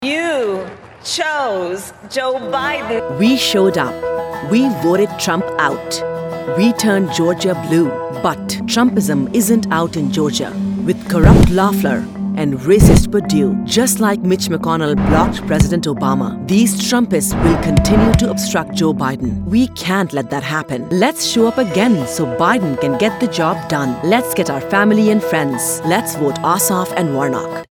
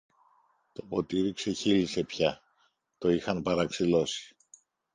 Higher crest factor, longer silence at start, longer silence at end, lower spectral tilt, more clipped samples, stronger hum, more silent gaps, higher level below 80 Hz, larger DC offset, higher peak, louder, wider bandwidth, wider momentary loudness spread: second, 14 dB vs 20 dB; second, 0 s vs 0.8 s; second, 0.05 s vs 0.65 s; about the same, -5 dB/octave vs -5 dB/octave; neither; neither; neither; first, -28 dBFS vs -60 dBFS; neither; first, 0 dBFS vs -12 dBFS; first, -15 LUFS vs -29 LUFS; first, 19 kHz vs 10 kHz; second, 8 LU vs 16 LU